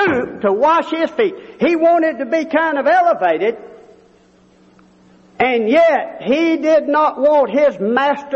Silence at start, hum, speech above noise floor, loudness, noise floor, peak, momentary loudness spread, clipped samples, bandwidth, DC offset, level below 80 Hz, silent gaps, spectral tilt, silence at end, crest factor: 0 s; none; 35 dB; -15 LUFS; -50 dBFS; -2 dBFS; 6 LU; under 0.1%; 7.8 kHz; under 0.1%; -58 dBFS; none; -6 dB/octave; 0 s; 14 dB